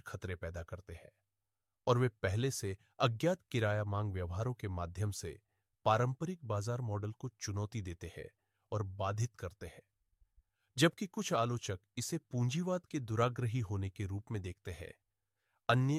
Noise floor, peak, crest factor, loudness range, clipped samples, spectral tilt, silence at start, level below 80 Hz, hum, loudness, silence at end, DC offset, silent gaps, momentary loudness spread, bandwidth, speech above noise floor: under -90 dBFS; -14 dBFS; 24 dB; 5 LU; under 0.1%; -5.5 dB/octave; 0.05 s; -62 dBFS; none; -37 LUFS; 0 s; under 0.1%; none; 15 LU; 15 kHz; over 53 dB